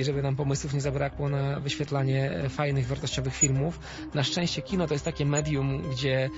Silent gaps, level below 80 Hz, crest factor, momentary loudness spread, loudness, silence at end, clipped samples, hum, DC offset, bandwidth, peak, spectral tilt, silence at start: none; -46 dBFS; 18 dB; 5 LU; -28 LUFS; 0 s; under 0.1%; none; under 0.1%; 8 kHz; -10 dBFS; -5 dB/octave; 0 s